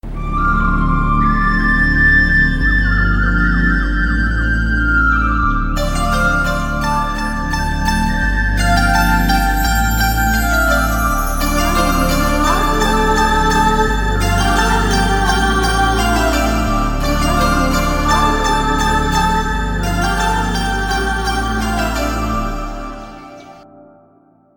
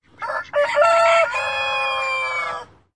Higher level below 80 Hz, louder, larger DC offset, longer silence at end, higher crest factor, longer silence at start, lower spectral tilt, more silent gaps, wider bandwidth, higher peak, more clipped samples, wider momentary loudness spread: first, -18 dBFS vs -60 dBFS; first, -15 LUFS vs -19 LUFS; second, under 0.1% vs 0.1%; first, 1 s vs 0.3 s; about the same, 14 dB vs 16 dB; second, 0.05 s vs 0.2 s; first, -4.5 dB/octave vs -1 dB/octave; neither; first, 17.5 kHz vs 11 kHz; about the same, -2 dBFS vs -4 dBFS; neither; second, 5 LU vs 13 LU